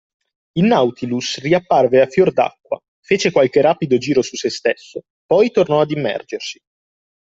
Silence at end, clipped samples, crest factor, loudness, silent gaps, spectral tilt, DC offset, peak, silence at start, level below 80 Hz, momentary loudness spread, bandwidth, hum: 0.8 s; under 0.1%; 16 dB; -17 LUFS; 2.88-3.03 s, 5.10-5.29 s; -5.5 dB/octave; under 0.1%; -2 dBFS; 0.55 s; -58 dBFS; 13 LU; 7.8 kHz; none